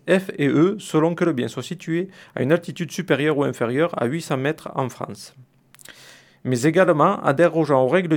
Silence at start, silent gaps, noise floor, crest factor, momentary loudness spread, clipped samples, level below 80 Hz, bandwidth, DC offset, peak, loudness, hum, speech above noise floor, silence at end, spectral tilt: 0.05 s; none; -48 dBFS; 18 dB; 12 LU; under 0.1%; -68 dBFS; 17.5 kHz; under 0.1%; -2 dBFS; -21 LUFS; none; 28 dB; 0 s; -6.5 dB/octave